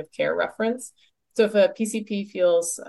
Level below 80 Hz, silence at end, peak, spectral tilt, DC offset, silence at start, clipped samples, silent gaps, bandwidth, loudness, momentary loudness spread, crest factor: -72 dBFS; 0 s; -8 dBFS; -4 dB/octave; under 0.1%; 0 s; under 0.1%; none; 12 kHz; -24 LUFS; 12 LU; 16 dB